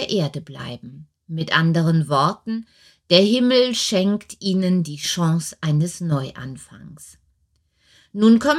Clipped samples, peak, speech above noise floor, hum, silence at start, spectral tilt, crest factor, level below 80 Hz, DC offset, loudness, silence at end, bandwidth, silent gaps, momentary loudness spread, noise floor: under 0.1%; -2 dBFS; 46 dB; none; 0 s; -5.5 dB/octave; 20 dB; -60 dBFS; under 0.1%; -19 LUFS; 0 s; 13.5 kHz; none; 18 LU; -66 dBFS